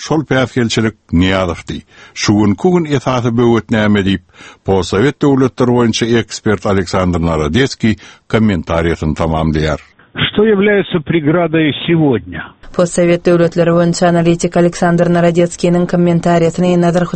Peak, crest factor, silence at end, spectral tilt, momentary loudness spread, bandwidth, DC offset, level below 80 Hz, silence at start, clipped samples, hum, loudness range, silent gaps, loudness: 0 dBFS; 12 dB; 0 s; -6 dB/octave; 6 LU; 8.8 kHz; under 0.1%; -34 dBFS; 0 s; under 0.1%; none; 3 LU; none; -13 LUFS